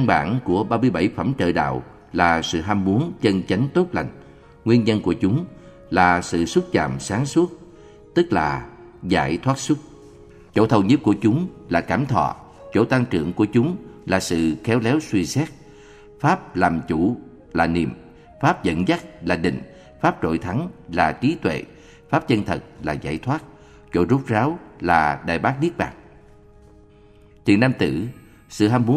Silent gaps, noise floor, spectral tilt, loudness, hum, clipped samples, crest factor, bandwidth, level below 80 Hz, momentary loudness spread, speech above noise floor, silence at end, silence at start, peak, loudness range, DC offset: none; -49 dBFS; -6.5 dB/octave; -21 LUFS; none; under 0.1%; 20 dB; 14 kHz; -46 dBFS; 10 LU; 29 dB; 0 s; 0 s; 0 dBFS; 3 LU; under 0.1%